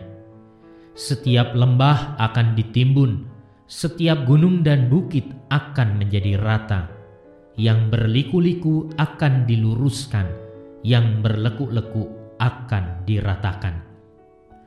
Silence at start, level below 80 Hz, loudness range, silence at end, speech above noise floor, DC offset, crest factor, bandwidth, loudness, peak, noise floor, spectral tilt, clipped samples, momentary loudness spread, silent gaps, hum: 0 s; -44 dBFS; 4 LU; 0.85 s; 32 dB; under 0.1%; 16 dB; 11.5 kHz; -20 LUFS; -4 dBFS; -50 dBFS; -7.5 dB/octave; under 0.1%; 12 LU; none; none